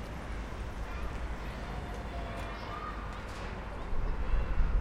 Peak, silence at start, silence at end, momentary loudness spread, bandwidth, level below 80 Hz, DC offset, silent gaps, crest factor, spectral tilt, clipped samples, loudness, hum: -16 dBFS; 0 s; 0 s; 6 LU; 11 kHz; -36 dBFS; under 0.1%; none; 18 dB; -6 dB/octave; under 0.1%; -39 LUFS; none